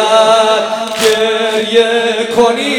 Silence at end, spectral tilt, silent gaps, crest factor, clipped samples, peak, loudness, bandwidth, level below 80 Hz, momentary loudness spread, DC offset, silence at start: 0 s; -2 dB/octave; none; 10 dB; 0.3%; 0 dBFS; -11 LUFS; 18 kHz; -54 dBFS; 5 LU; under 0.1%; 0 s